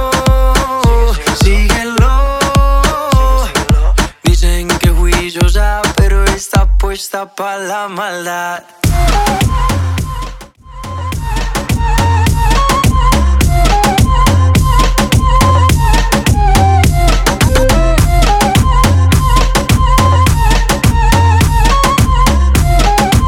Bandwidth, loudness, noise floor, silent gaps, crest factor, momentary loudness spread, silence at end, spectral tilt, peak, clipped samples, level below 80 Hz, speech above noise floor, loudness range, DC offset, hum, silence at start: 17 kHz; -11 LUFS; -30 dBFS; none; 10 dB; 9 LU; 0 s; -5 dB/octave; 0 dBFS; under 0.1%; -12 dBFS; 14 dB; 5 LU; under 0.1%; none; 0 s